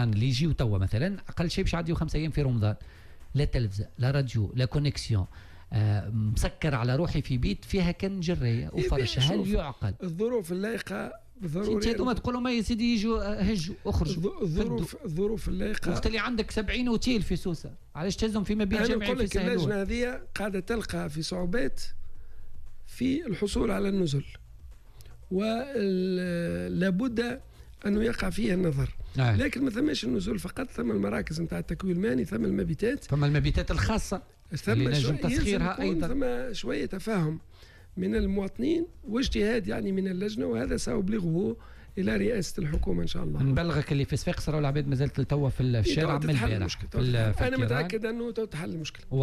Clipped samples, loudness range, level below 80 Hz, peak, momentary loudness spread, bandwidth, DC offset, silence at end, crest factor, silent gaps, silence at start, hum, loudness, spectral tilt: under 0.1%; 3 LU; -38 dBFS; -14 dBFS; 7 LU; 14 kHz; under 0.1%; 0 s; 14 dB; none; 0 s; none; -29 LUFS; -6.5 dB/octave